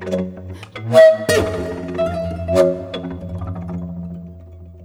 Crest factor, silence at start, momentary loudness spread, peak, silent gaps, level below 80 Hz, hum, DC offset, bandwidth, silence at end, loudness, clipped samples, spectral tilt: 18 dB; 0 s; 21 LU; 0 dBFS; none; -42 dBFS; none; under 0.1%; 16.5 kHz; 0 s; -18 LUFS; under 0.1%; -5.5 dB/octave